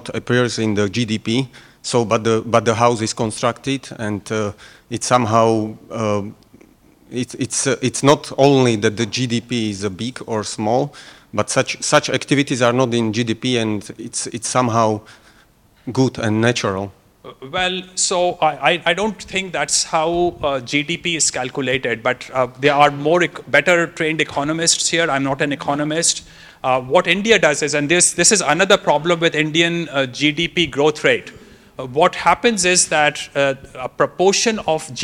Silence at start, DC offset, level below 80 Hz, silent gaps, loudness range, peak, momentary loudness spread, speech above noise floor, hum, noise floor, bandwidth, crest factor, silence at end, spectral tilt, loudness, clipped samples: 0 s; under 0.1%; -52 dBFS; none; 5 LU; 0 dBFS; 10 LU; 34 dB; none; -52 dBFS; 16 kHz; 18 dB; 0 s; -3.5 dB/octave; -17 LUFS; under 0.1%